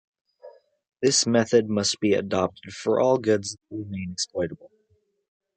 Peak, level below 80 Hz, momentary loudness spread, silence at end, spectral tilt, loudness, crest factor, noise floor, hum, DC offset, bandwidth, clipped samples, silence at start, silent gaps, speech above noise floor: -6 dBFS; -56 dBFS; 13 LU; 0.9 s; -4 dB/octave; -24 LUFS; 20 dB; -68 dBFS; none; under 0.1%; 9.4 kHz; under 0.1%; 0.45 s; none; 44 dB